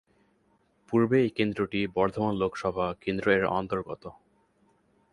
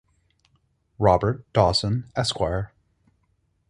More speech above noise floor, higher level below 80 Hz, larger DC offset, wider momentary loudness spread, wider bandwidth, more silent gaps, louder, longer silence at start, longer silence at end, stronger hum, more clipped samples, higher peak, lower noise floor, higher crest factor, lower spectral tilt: second, 41 dB vs 47 dB; second, -56 dBFS vs -42 dBFS; neither; about the same, 9 LU vs 7 LU; about the same, 11 kHz vs 11.5 kHz; neither; second, -28 LUFS vs -23 LUFS; about the same, 0.9 s vs 1 s; about the same, 1 s vs 1.05 s; neither; neither; second, -10 dBFS vs -4 dBFS; about the same, -68 dBFS vs -69 dBFS; about the same, 20 dB vs 22 dB; first, -7.5 dB/octave vs -5.5 dB/octave